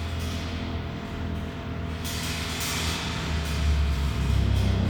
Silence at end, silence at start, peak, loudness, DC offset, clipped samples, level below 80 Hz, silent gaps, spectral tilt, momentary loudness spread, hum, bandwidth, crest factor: 0 s; 0 s; -12 dBFS; -28 LUFS; under 0.1%; under 0.1%; -30 dBFS; none; -5 dB/octave; 8 LU; none; over 20 kHz; 14 dB